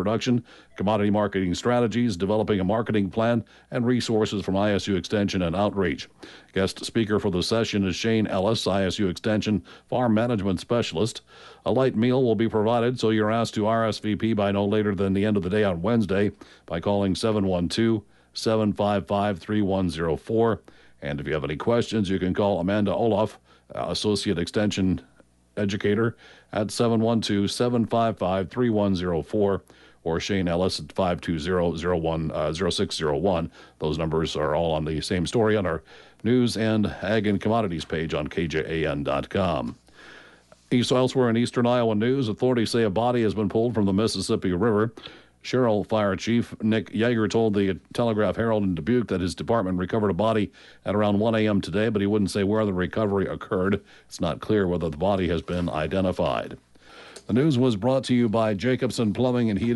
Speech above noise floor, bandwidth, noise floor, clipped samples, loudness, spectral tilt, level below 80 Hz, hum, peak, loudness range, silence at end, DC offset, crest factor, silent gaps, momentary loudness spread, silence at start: 29 dB; 11.5 kHz; -53 dBFS; under 0.1%; -24 LUFS; -6 dB/octave; -50 dBFS; none; -12 dBFS; 2 LU; 0 s; under 0.1%; 12 dB; none; 6 LU; 0 s